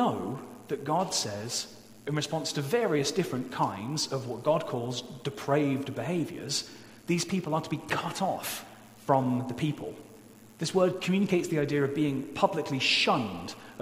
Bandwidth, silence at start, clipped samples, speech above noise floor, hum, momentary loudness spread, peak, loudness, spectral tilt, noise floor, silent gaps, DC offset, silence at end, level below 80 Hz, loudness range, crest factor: 16 kHz; 0 s; under 0.1%; 22 dB; none; 11 LU; -10 dBFS; -30 LUFS; -4.5 dB/octave; -52 dBFS; none; under 0.1%; 0 s; -66 dBFS; 4 LU; 20 dB